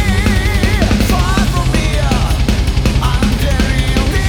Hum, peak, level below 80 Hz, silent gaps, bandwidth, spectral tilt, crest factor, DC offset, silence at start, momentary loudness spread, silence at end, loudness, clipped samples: none; 0 dBFS; -16 dBFS; none; 18 kHz; -5.5 dB/octave; 12 dB; under 0.1%; 0 s; 2 LU; 0 s; -14 LUFS; under 0.1%